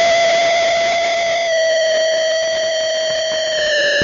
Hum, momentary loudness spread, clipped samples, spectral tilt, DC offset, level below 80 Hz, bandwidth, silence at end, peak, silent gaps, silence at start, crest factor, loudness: none; 4 LU; under 0.1%; 1.5 dB/octave; under 0.1%; -54 dBFS; 7.6 kHz; 0 s; -6 dBFS; none; 0 s; 8 dB; -15 LUFS